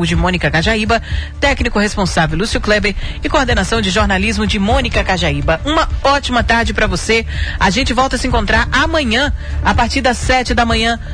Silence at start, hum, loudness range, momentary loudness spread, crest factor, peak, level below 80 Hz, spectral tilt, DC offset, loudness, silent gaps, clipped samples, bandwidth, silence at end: 0 s; none; 1 LU; 3 LU; 14 dB; 0 dBFS; -22 dBFS; -4.5 dB/octave; under 0.1%; -14 LUFS; none; under 0.1%; 10.5 kHz; 0 s